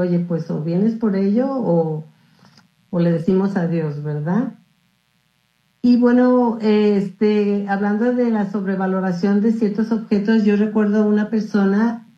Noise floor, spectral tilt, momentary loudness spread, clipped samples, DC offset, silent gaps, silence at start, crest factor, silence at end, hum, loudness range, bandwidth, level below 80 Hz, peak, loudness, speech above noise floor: -64 dBFS; -9 dB/octave; 6 LU; under 0.1%; under 0.1%; none; 0 s; 14 dB; 0.2 s; none; 5 LU; 6.6 kHz; -62 dBFS; -4 dBFS; -18 LUFS; 46 dB